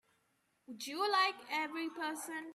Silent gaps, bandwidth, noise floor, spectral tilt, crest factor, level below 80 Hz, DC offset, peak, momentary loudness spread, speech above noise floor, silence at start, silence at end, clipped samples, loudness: none; 15 kHz; -78 dBFS; -1 dB/octave; 20 dB; under -90 dBFS; under 0.1%; -20 dBFS; 13 LU; 41 dB; 0.7 s; 0 s; under 0.1%; -36 LUFS